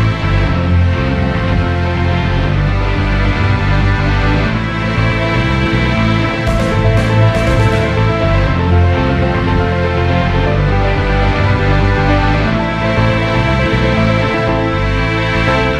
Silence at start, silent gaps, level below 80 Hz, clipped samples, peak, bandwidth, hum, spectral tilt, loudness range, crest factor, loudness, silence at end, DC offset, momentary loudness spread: 0 s; none; -20 dBFS; under 0.1%; 0 dBFS; 10 kHz; none; -7 dB/octave; 2 LU; 12 dB; -13 LUFS; 0 s; under 0.1%; 3 LU